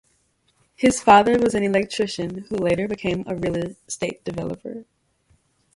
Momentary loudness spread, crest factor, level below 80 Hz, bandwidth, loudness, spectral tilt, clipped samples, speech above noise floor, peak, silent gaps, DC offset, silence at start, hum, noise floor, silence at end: 16 LU; 22 dB; -52 dBFS; 11.5 kHz; -21 LUFS; -5 dB/octave; under 0.1%; 44 dB; 0 dBFS; none; under 0.1%; 0.8 s; none; -65 dBFS; 0.9 s